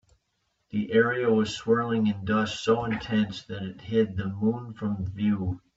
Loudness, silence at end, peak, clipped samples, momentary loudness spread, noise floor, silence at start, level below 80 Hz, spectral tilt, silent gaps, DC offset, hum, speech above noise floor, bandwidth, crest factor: -27 LUFS; 0.2 s; -10 dBFS; under 0.1%; 9 LU; -75 dBFS; 0.75 s; -56 dBFS; -6.5 dB/octave; none; under 0.1%; none; 49 dB; 8 kHz; 18 dB